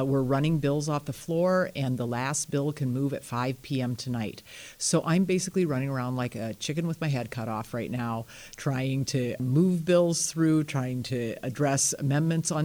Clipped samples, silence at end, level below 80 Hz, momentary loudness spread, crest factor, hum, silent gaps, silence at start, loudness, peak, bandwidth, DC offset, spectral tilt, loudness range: under 0.1%; 0 s; -60 dBFS; 9 LU; 16 dB; none; none; 0 s; -28 LUFS; -12 dBFS; over 20 kHz; under 0.1%; -5.5 dB/octave; 5 LU